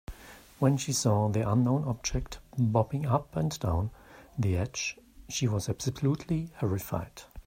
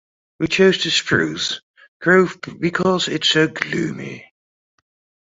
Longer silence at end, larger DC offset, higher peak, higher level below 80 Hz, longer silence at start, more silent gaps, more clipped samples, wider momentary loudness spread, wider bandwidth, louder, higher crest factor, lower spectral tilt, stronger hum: second, 0.05 s vs 1.1 s; neither; second, -10 dBFS vs -2 dBFS; first, -48 dBFS vs -56 dBFS; second, 0.1 s vs 0.4 s; second, none vs 1.63-1.74 s, 1.88-2.00 s; neither; about the same, 12 LU vs 12 LU; first, 16 kHz vs 8 kHz; second, -30 LUFS vs -18 LUFS; about the same, 20 dB vs 18 dB; first, -5.5 dB/octave vs -4 dB/octave; neither